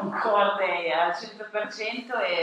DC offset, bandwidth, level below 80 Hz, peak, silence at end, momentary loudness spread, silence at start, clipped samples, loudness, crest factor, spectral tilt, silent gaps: under 0.1%; 9.4 kHz; -84 dBFS; -10 dBFS; 0 s; 9 LU; 0 s; under 0.1%; -26 LUFS; 18 dB; -4 dB/octave; none